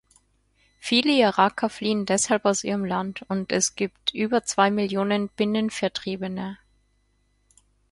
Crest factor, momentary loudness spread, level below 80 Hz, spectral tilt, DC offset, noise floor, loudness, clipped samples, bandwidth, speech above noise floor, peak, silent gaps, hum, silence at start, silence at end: 20 dB; 10 LU; -62 dBFS; -3.5 dB/octave; under 0.1%; -67 dBFS; -24 LUFS; under 0.1%; 11.5 kHz; 43 dB; -4 dBFS; none; 50 Hz at -65 dBFS; 0.8 s; 1.35 s